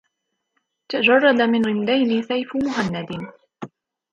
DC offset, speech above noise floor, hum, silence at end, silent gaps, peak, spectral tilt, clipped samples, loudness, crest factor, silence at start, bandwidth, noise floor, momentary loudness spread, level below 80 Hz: under 0.1%; 57 dB; none; 0.45 s; none; -2 dBFS; -6 dB/octave; under 0.1%; -19 LUFS; 18 dB; 0.9 s; 7.6 kHz; -76 dBFS; 24 LU; -60 dBFS